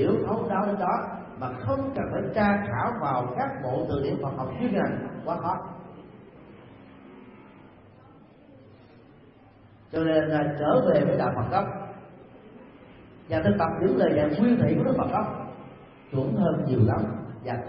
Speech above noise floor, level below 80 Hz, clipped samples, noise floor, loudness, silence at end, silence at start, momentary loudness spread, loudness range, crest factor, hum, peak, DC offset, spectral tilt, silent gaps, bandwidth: 28 dB; -54 dBFS; under 0.1%; -53 dBFS; -26 LUFS; 0 s; 0 s; 13 LU; 8 LU; 18 dB; none; -8 dBFS; under 0.1%; -12 dB/octave; none; 5.6 kHz